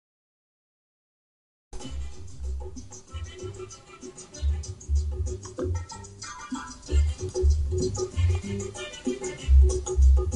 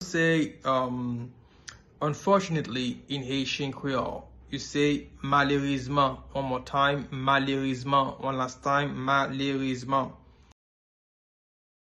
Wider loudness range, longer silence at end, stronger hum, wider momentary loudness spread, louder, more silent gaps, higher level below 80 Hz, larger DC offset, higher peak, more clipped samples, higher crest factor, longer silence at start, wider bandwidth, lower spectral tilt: first, 14 LU vs 4 LU; second, 0 s vs 1.7 s; neither; first, 19 LU vs 11 LU; about the same, -28 LUFS vs -28 LUFS; neither; first, -28 dBFS vs -54 dBFS; neither; about the same, -10 dBFS vs -10 dBFS; neither; about the same, 18 dB vs 20 dB; first, 1.75 s vs 0 s; about the same, 10.5 kHz vs 11.5 kHz; about the same, -6 dB/octave vs -5.5 dB/octave